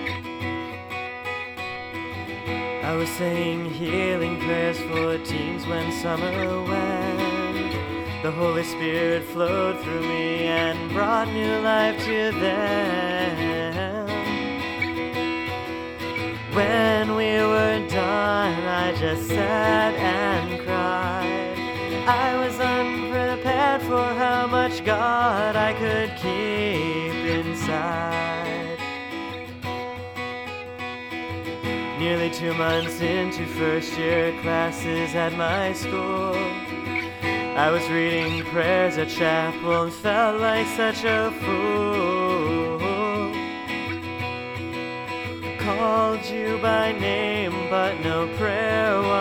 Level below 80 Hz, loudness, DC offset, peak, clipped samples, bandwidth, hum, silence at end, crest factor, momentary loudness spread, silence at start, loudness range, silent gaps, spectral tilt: -52 dBFS; -24 LUFS; under 0.1%; -4 dBFS; under 0.1%; 19.5 kHz; none; 0 s; 18 dB; 9 LU; 0 s; 5 LU; none; -5.5 dB/octave